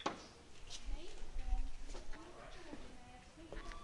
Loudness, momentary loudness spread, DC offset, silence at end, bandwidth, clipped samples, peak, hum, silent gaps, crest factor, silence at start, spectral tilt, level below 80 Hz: -52 LUFS; 11 LU; under 0.1%; 0 s; 11 kHz; under 0.1%; -24 dBFS; none; none; 18 dB; 0 s; -4 dB/octave; -46 dBFS